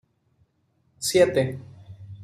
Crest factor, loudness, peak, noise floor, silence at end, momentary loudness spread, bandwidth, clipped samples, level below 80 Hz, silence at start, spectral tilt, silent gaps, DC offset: 20 dB; -22 LUFS; -6 dBFS; -68 dBFS; 0 s; 26 LU; 15 kHz; under 0.1%; -64 dBFS; 1 s; -4.5 dB/octave; none; under 0.1%